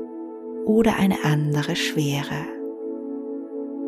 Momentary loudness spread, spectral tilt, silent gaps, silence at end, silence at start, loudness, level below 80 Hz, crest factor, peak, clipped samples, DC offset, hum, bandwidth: 13 LU; -6 dB/octave; none; 0 s; 0 s; -24 LUFS; -52 dBFS; 16 dB; -8 dBFS; under 0.1%; under 0.1%; none; 15 kHz